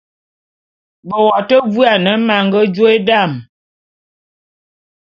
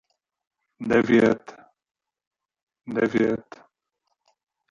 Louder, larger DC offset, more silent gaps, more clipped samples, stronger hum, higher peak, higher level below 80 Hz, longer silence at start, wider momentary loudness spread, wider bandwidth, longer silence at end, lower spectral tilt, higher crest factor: first, -12 LUFS vs -22 LUFS; neither; second, none vs 2.27-2.31 s, 2.63-2.67 s; neither; neither; first, 0 dBFS vs -6 dBFS; about the same, -60 dBFS vs -60 dBFS; first, 1.05 s vs 0.8 s; second, 6 LU vs 13 LU; about the same, 6.8 kHz vs 7.4 kHz; first, 1.6 s vs 1.3 s; about the same, -7.5 dB/octave vs -7 dB/octave; second, 14 dB vs 20 dB